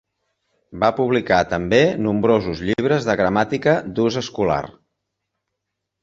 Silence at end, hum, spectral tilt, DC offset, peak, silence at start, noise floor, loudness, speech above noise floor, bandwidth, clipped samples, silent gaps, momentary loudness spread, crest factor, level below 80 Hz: 1.35 s; none; -6 dB/octave; under 0.1%; -2 dBFS; 0.7 s; -79 dBFS; -19 LUFS; 61 dB; 7.8 kHz; under 0.1%; none; 5 LU; 18 dB; -48 dBFS